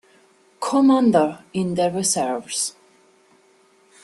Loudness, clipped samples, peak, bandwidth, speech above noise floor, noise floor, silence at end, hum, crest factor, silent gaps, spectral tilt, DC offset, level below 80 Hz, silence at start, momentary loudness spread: -20 LUFS; under 0.1%; -4 dBFS; 12.5 kHz; 37 dB; -57 dBFS; 1.35 s; none; 18 dB; none; -4.5 dB/octave; under 0.1%; -64 dBFS; 0.6 s; 10 LU